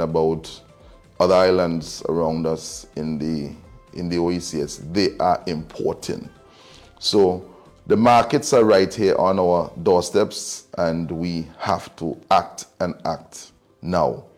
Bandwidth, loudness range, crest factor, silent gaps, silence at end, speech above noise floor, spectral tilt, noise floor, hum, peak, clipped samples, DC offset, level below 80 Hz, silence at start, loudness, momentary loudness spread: 15 kHz; 7 LU; 18 dB; none; 0.15 s; 28 dB; -5 dB/octave; -48 dBFS; none; -4 dBFS; under 0.1%; under 0.1%; -50 dBFS; 0 s; -21 LUFS; 15 LU